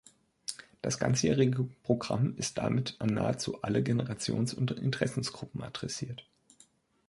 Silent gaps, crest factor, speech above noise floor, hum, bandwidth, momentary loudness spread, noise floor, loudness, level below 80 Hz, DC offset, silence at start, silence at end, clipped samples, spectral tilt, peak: none; 20 dB; 34 dB; none; 11.5 kHz; 13 LU; -65 dBFS; -32 LUFS; -60 dBFS; under 0.1%; 0.5 s; 0.85 s; under 0.1%; -5.5 dB/octave; -12 dBFS